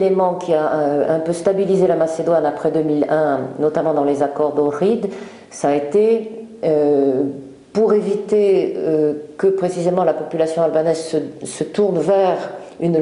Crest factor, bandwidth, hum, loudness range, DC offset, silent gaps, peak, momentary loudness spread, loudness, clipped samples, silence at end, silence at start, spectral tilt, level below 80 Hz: 16 dB; 11 kHz; none; 1 LU; under 0.1%; none; -2 dBFS; 8 LU; -18 LUFS; under 0.1%; 0 s; 0 s; -6.5 dB/octave; -62 dBFS